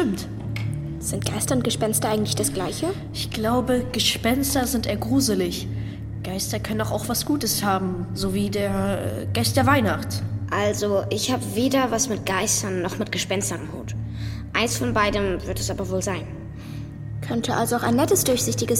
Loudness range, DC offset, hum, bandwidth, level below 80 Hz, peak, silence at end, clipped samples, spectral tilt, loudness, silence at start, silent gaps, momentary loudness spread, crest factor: 3 LU; under 0.1%; none; 16.5 kHz; -42 dBFS; -4 dBFS; 0 s; under 0.1%; -4 dB/octave; -23 LUFS; 0 s; none; 10 LU; 20 dB